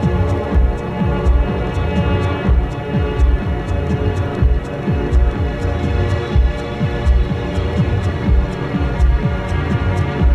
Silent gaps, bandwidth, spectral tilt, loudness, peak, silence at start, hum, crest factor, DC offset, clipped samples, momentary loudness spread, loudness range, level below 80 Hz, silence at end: none; 8.2 kHz; -8 dB/octave; -18 LUFS; -2 dBFS; 0 s; none; 12 dB; under 0.1%; under 0.1%; 3 LU; 1 LU; -18 dBFS; 0 s